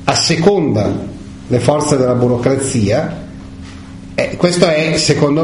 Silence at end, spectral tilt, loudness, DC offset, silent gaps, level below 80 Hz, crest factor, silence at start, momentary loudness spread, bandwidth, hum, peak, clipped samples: 0 s; -5 dB/octave; -14 LUFS; under 0.1%; none; -38 dBFS; 14 dB; 0 s; 20 LU; 11 kHz; none; 0 dBFS; under 0.1%